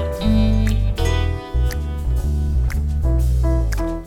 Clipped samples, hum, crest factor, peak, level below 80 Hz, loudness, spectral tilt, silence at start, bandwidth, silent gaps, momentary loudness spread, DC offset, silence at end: under 0.1%; none; 12 dB; -6 dBFS; -20 dBFS; -20 LUFS; -7 dB/octave; 0 s; 15 kHz; none; 5 LU; under 0.1%; 0 s